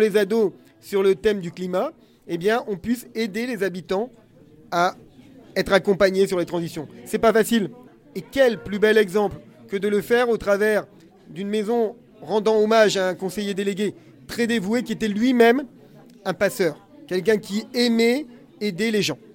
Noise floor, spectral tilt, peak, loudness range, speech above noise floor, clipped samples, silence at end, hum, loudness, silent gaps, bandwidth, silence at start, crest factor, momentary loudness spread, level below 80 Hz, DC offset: -48 dBFS; -5 dB/octave; -4 dBFS; 4 LU; 26 dB; under 0.1%; 0.2 s; none; -22 LUFS; none; 17 kHz; 0 s; 18 dB; 13 LU; -54 dBFS; under 0.1%